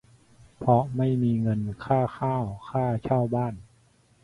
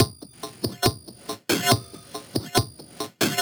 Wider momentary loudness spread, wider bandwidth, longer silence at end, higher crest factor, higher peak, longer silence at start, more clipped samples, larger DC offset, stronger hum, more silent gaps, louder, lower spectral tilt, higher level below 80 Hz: second, 8 LU vs 17 LU; second, 10.5 kHz vs over 20 kHz; first, 0.6 s vs 0 s; second, 18 dB vs 24 dB; second, -8 dBFS vs -2 dBFS; first, 0.6 s vs 0 s; neither; neither; neither; neither; about the same, -26 LUFS vs -25 LUFS; first, -10 dB/octave vs -3.5 dB/octave; about the same, -54 dBFS vs -52 dBFS